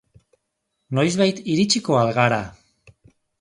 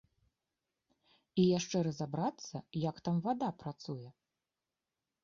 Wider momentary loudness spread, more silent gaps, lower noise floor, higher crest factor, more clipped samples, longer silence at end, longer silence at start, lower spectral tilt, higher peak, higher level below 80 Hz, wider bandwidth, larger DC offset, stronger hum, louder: second, 8 LU vs 15 LU; neither; second, -76 dBFS vs under -90 dBFS; about the same, 20 dB vs 18 dB; neither; second, 0.9 s vs 1.1 s; second, 0.9 s vs 1.35 s; second, -5 dB/octave vs -7 dB/octave; first, -2 dBFS vs -18 dBFS; first, -56 dBFS vs -72 dBFS; first, 11.5 kHz vs 7.4 kHz; neither; neither; first, -20 LUFS vs -36 LUFS